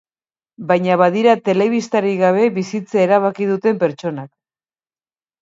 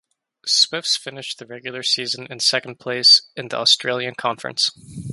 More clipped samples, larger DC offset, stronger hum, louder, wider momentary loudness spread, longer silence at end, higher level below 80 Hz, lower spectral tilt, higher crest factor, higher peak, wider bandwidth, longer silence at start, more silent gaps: neither; neither; neither; about the same, -16 LUFS vs -17 LUFS; second, 10 LU vs 18 LU; first, 1.15 s vs 0 s; second, -68 dBFS vs -62 dBFS; first, -6.5 dB/octave vs -1 dB/octave; about the same, 16 dB vs 20 dB; about the same, 0 dBFS vs -2 dBFS; second, 7.8 kHz vs 11.5 kHz; first, 0.6 s vs 0.45 s; neither